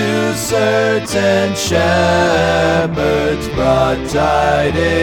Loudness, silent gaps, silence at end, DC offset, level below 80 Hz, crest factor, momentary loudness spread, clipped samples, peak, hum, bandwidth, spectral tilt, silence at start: -14 LUFS; none; 0 s; under 0.1%; -32 dBFS; 14 dB; 3 LU; under 0.1%; 0 dBFS; none; 19.5 kHz; -5 dB/octave; 0 s